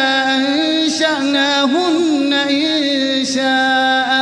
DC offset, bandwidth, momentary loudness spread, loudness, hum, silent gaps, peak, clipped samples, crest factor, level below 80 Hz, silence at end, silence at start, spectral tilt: under 0.1%; 10.5 kHz; 2 LU; -14 LUFS; none; none; -2 dBFS; under 0.1%; 12 dB; -62 dBFS; 0 s; 0 s; -2 dB/octave